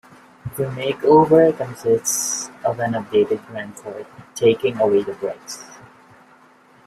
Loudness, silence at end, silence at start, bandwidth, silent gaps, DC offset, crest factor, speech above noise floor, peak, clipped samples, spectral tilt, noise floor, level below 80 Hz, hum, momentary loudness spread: -19 LUFS; 1.1 s; 0.45 s; 15 kHz; none; under 0.1%; 18 dB; 32 dB; -2 dBFS; under 0.1%; -4.5 dB/octave; -51 dBFS; -58 dBFS; none; 20 LU